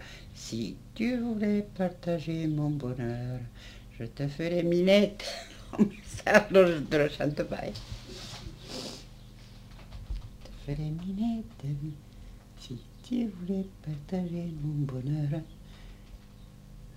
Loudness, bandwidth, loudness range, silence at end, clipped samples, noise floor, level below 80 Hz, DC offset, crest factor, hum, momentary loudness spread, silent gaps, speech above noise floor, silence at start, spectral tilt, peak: -30 LUFS; 16 kHz; 12 LU; 0.05 s; under 0.1%; -50 dBFS; -50 dBFS; under 0.1%; 28 dB; 50 Hz at -55 dBFS; 25 LU; none; 21 dB; 0 s; -6.5 dB/octave; -4 dBFS